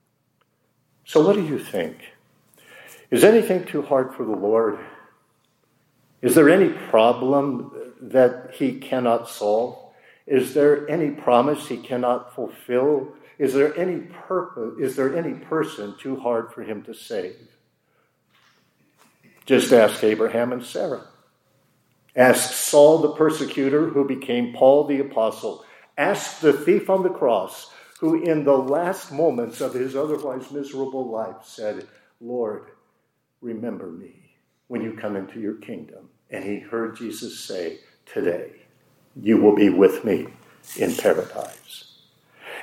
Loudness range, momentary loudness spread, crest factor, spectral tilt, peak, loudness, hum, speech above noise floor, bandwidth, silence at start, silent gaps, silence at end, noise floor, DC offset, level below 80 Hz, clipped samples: 13 LU; 18 LU; 20 dB; -5 dB/octave; -2 dBFS; -21 LUFS; none; 50 dB; 16.5 kHz; 1.1 s; none; 0 s; -70 dBFS; under 0.1%; -76 dBFS; under 0.1%